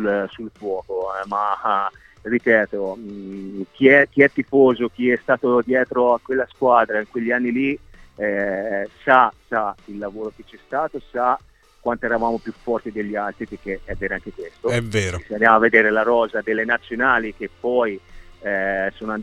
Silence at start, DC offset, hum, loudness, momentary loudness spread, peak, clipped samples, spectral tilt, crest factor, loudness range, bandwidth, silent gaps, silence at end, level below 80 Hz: 0 s; under 0.1%; none; -20 LUFS; 15 LU; 0 dBFS; under 0.1%; -6 dB/octave; 20 dB; 7 LU; 11.5 kHz; none; 0 s; -48 dBFS